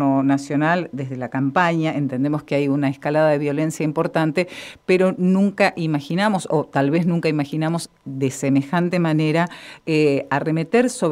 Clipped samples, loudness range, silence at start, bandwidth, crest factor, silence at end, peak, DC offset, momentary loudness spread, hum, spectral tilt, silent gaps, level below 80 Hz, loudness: under 0.1%; 1 LU; 0 s; 14.5 kHz; 18 dB; 0 s; -2 dBFS; under 0.1%; 6 LU; none; -6.5 dB/octave; none; -62 dBFS; -20 LUFS